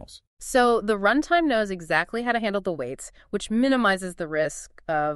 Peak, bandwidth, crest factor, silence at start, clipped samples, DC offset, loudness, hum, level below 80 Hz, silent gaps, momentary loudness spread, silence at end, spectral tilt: -6 dBFS; 13 kHz; 18 dB; 0 s; under 0.1%; under 0.1%; -24 LUFS; none; -50 dBFS; 0.27-0.37 s; 12 LU; 0 s; -4.5 dB/octave